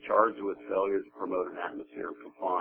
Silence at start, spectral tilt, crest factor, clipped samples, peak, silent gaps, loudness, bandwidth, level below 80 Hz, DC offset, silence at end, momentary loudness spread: 0 s; -8.5 dB/octave; 22 dB; under 0.1%; -10 dBFS; none; -32 LUFS; 3.6 kHz; -74 dBFS; under 0.1%; 0 s; 13 LU